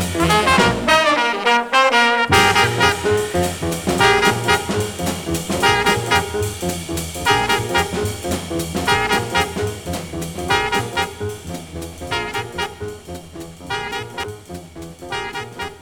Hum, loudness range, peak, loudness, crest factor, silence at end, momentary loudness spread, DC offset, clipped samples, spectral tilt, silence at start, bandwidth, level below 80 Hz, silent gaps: none; 12 LU; -2 dBFS; -18 LUFS; 18 dB; 0 s; 17 LU; under 0.1%; under 0.1%; -3.5 dB/octave; 0 s; over 20 kHz; -40 dBFS; none